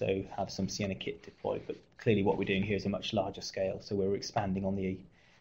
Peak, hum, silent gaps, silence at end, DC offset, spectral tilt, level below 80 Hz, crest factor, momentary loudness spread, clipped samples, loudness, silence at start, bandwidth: -16 dBFS; none; none; 0.35 s; under 0.1%; -5.5 dB/octave; -58 dBFS; 18 dB; 10 LU; under 0.1%; -34 LUFS; 0 s; 16 kHz